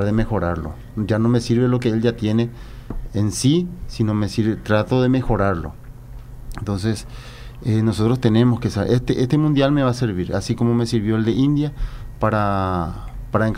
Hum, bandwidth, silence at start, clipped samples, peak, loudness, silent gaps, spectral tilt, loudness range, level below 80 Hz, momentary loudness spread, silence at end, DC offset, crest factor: none; 14.5 kHz; 0 s; under 0.1%; -4 dBFS; -20 LUFS; none; -7 dB/octave; 4 LU; -34 dBFS; 17 LU; 0 s; under 0.1%; 16 dB